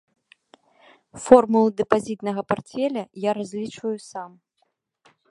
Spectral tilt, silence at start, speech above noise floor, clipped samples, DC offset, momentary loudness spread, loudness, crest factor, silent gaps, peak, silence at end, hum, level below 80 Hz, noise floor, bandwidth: -6 dB/octave; 1.15 s; 50 dB; under 0.1%; under 0.1%; 20 LU; -22 LUFS; 24 dB; none; 0 dBFS; 1.05 s; none; -62 dBFS; -72 dBFS; 11.5 kHz